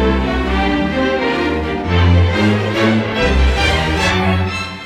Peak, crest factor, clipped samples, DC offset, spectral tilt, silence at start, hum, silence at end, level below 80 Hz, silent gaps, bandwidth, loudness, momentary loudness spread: -2 dBFS; 12 dB; under 0.1%; under 0.1%; -6 dB/octave; 0 s; none; 0 s; -22 dBFS; none; 11.5 kHz; -15 LUFS; 4 LU